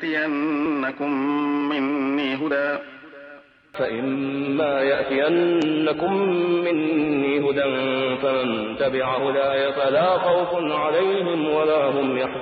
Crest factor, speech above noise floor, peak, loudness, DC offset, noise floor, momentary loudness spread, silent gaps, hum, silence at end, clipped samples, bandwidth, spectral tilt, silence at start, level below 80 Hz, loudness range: 12 dB; 25 dB; -8 dBFS; -22 LUFS; under 0.1%; -46 dBFS; 5 LU; none; none; 0 s; under 0.1%; 7.2 kHz; -7.5 dB/octave; 0 s; -62 dBFS; 4 LU